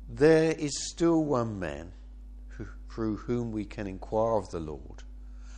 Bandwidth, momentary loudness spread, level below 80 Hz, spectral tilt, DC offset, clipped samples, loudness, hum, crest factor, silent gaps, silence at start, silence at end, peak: 9.8 kHz; 24 LU; -46 dBFS; -5.5 dB/octave; under 0.1%; under 0.1%; -29 LUFS; none; 20 dB; none; 0 s; 0 s; -10 dBFS